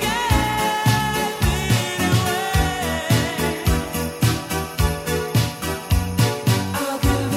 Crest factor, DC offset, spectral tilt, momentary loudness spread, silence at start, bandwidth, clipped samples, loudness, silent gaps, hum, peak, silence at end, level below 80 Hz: 16 dB; under 0.1%; -4.5 dB/octave; 5 LU; 0 s; 16 kHz; under 0.1%; -21 LUFS; none; none; -4 dBFS; 0 s; -30 dBFS